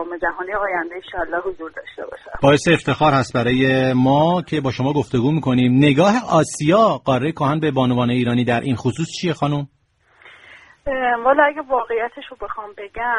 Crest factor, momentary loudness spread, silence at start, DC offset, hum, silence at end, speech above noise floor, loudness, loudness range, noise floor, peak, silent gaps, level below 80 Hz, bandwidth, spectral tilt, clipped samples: 18 dB; 15 LU; 0 s; under 0.1%; none; 0 s; 35 dB; -18 LUFS; 5 LU; -53 dBFS; 0 dBFS; none; -46 dBFS; 11.5 kHz; -6 dB/octave; under 0.1%